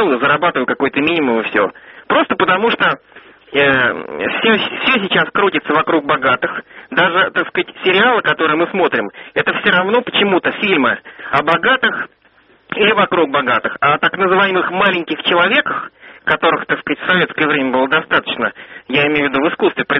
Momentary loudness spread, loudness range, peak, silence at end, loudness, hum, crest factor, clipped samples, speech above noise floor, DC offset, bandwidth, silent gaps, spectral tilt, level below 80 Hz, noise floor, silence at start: 8 LU; 1 LU; 0 dBFS; 0 s; -14 LUFS; none; 16 dB; under 0.1%; 36 dB; under 0.1%; 5.8 kHz; none; -1.5 dB/octave; -54 dBFS; -51 dBFS; 0 s